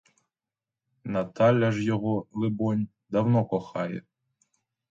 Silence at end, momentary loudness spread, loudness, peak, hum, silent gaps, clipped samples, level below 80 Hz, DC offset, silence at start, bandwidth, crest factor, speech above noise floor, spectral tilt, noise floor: 0.9 s; 10 LU; -27 LUFS; -8 dBFS; none; none; under 0.1%; -62 dBFS; under 0.1%; 1.05 s; 7.6 kHz; 20 dB; over 65 dB; -8.5 dB/octave; under -90 dBFS